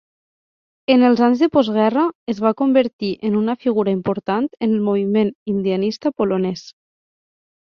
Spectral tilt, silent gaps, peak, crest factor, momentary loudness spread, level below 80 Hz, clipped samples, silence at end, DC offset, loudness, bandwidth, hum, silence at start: -7.5 dB/octave; 2.15-2.27 s, 2.93-2.99 s, 5.35-5.46 s; -2 dBFS; 18 dB; 7 LU; -60 dBFS; under 0.1%; 0.95 s; under 0.1%; -18 LUFS; 6.8 kHz; none; 0.9 s